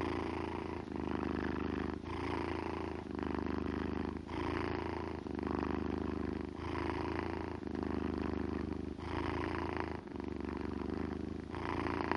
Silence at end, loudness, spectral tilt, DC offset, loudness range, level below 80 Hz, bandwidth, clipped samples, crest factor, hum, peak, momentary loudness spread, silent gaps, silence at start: 0 s; -40 LUFS; -7.5 dB/octave; under 0.1%; 1 LU; -52 dBFS; 11 kHz; under 0.1%; 24 dB; none; -14 dBFS; 4 LU; none; 0 s